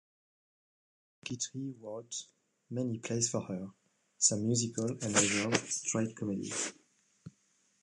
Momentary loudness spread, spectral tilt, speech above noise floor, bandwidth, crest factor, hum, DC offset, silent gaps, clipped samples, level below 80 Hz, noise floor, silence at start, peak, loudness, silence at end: 14 LU; -3 dB/octave; 39 dB; 11.5 kHz; 30 dB; none; under 0.1%; none; under 0.1%; -70 dBFS; -73 dBFS; 1.25 s; -8 dBFS; -33 LUFS; 0.55 s